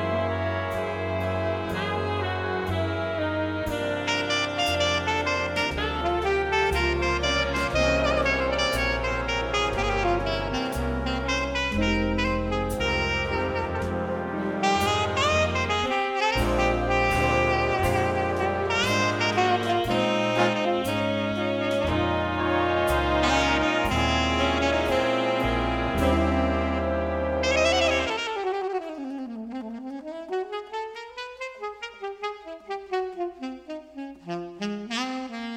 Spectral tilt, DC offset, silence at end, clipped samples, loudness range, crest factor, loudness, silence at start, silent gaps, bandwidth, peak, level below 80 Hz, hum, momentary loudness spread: -5 dB/octave; under 0.1%; 0 s; under 0.1%; 10 LU; 18 dB; -25 LUFS; 0 s; none; 17 kHz; -8 dBFS; -38 dBFS; none; 12 LU